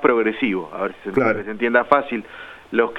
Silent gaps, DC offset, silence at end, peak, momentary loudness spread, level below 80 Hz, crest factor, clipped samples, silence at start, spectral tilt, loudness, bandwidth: none; under 0.1%; 0 s; 0 dBFS; 12 LU; -56 dBFS; 20 dB; under 0.1%; 0 s; -7 dB/octave; -21 LUFS; 6.2 kHz